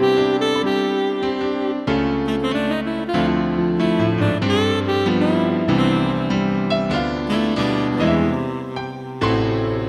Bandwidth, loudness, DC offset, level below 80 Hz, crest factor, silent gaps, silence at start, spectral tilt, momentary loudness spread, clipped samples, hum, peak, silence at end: 12.5 kHz; -20 LUFS; under 0.1%; -40 dBFS; 14 dB; none; 0 s; -7 dB/octave; 5 LU; under 0.1%; none; -6 dBFS; 0 s